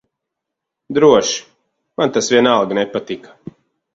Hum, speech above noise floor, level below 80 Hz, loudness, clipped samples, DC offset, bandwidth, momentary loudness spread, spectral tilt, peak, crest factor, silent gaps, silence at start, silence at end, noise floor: none; 66 dB; -58 dBFS; -15 LUFS; under 0.1%; under 0.1%; 7.8 kHz; 16 LU; -3.5 dB/octave; 0 dBFS; 18 dB; none; 0.9 s; 0.75 s; -80 dBFS